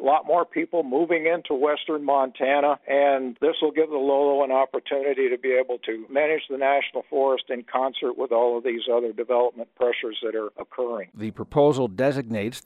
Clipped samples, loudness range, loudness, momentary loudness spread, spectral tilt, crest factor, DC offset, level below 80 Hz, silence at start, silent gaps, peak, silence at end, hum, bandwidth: under 0.1%; 3 LU; -24 LUFS; 8 LU; -6 dB/octave; 16 dB; under 0.1%; -66 dBFS; 0 s; none; -6 dBFS; 0.05 s; none; 12.5 kHz